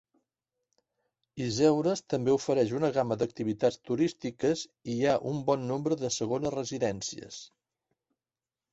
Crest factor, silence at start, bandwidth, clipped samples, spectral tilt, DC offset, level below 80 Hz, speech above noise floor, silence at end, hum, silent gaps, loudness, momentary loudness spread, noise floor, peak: 18 dB; 1.35 s; 8.2 kHz; under 0.1%; -5.5 dB/octave; under 0.1%; -66 dBFS; over 61 dB; 1.25 s; none; none; -30 LUFS; 10 LU; under -90 dBFS; -12 dBFS